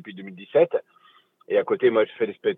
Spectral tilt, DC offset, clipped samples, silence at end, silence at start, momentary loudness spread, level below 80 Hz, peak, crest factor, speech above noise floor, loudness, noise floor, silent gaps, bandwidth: -8.5 dB/octave; under 0.1%; under 0.1%; 0 s; 0.05 s; 12 LU; -82 dBFS; -6 dBFS; 18 dB; 35 dB; -23 LUFS; -58 dBFS; none; 4 kHz